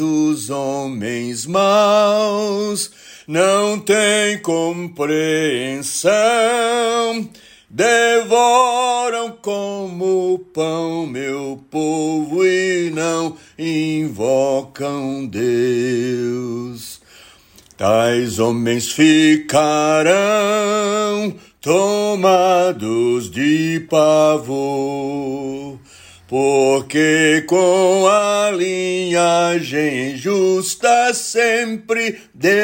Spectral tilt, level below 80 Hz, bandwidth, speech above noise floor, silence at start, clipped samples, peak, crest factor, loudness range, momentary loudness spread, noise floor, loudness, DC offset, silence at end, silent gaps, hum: -4 dB/octave; -60 dBFS; 16.5 kHz; 31 dB; 0 s; under 0.1%; -2 dBFS; 14 dB; 5 LU; 10 LU; -47 dBFS; -16 LUFS; under 0.1%; 0 s; none; none